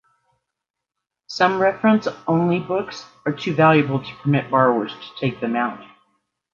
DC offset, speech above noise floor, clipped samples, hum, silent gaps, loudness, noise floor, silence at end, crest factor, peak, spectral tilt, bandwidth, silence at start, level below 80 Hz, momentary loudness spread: under 0.1%; 64 dB; under 0.1%; none; none; -20 LUFS; -83 dBFS; 0.7 s; 18 dB; -4 dBFS; -7 dB/octave; 7.4 kHz; 1.3 s; -62 dBFS; 12 LU